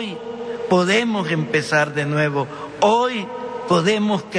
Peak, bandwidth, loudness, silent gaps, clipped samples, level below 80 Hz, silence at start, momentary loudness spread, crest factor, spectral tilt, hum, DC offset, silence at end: -4 dBFS; 10.5 kHz; -20 LUFS; none; under 0.1%; -60 dBFS; 0 s; 12 LU; 16 dB; -5 dB/octave; none; under 0.1%; 0 s